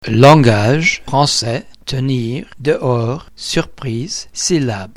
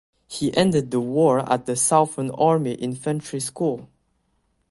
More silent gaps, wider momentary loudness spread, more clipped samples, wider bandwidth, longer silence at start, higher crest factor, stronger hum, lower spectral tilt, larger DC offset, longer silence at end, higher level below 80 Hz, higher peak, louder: neither; first, 15 LU vs 9 LU; first, 0.7% vs under 0.1%; first, 14 kHz vs 12 kHz; second, 0 s vs 0.3 s; second, 14 dB vs 20 dB; neither; about the same, -5 dB/octave vs -5 dB/octave; neither; second, 0.05 s vs 0.85 s; first, -40 dBFS vs -58 dBFS; about the same, 0 dBFS vs -2 dBFS; first, -15 LUFS vs -22 LUFS